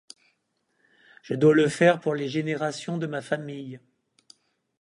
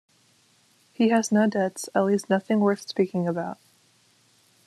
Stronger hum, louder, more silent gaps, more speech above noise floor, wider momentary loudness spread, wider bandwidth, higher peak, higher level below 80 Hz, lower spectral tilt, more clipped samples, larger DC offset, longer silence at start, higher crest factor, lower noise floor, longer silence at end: neither; about the same, -24 LUFS vs -24 LUFS; neither; first, 49 dB vs 39 dB; first, 16 LU vs 8 LU; second, 11 kHz vs 13 kHz; about the same, -6 dBFS vs -8 dBFS; about the same, -70 dBFS vs -72 dBFS; about the same, -6 dB/octave vs -5.5 dB/octave; neither; neither; first, 1.3 s vs 1 s; about the same, 20 dB vs 18 dB; first, -74 dBFS vs -62 dBFS; about the same, 1.05 s vs 1.15 s